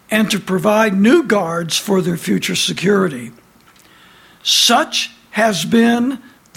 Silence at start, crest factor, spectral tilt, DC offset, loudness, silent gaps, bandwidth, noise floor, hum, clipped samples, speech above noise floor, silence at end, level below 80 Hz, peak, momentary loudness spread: 0.1 s; 16 dB; -3.5 dB/octave; under 0.1%; -15 LUFS; none; 16.5 kHz; -48 dBFS; none; under 0.1%; 33 dB; 0.4 s; -58 dBFS; 0 dBFS; 10 LU